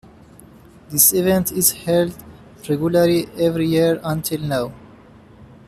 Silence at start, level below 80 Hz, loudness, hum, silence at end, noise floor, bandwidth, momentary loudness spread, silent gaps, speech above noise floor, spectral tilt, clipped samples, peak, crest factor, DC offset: 0.9 s; -50 dBFS; -18 LUFS; none; 0.25 s; -45 dBFS; 15 kHz; 11 LU; none; 27 dB; -4.5 dB/octave; under 0.1%; 0 dBFS; 20 dB; under 0.1%